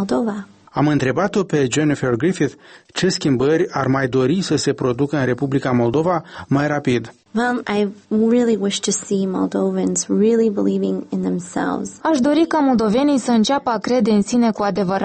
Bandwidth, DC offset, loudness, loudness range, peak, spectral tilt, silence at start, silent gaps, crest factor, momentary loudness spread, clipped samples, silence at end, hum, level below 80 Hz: 8.8 kHz; under 0.1%; -18 LUFS; 2 LU; -6 dBFS; -5.5 dB/octave; 0 s; none; 12 dB; 6 LU; under 0.1%; 0 s; none; -52 dBFS